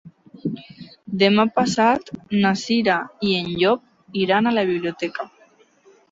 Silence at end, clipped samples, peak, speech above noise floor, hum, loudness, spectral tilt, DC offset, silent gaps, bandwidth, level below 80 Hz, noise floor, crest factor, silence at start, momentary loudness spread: 0.85 s; under 0.1%; -4 dBFS; 36 dB; none; -21 LUFS; -5 dB/octave; under 0.1%; none; 8 kHz; -60 dBFS; -55 dBFS; 18 dB; 0.05 s; 13 LU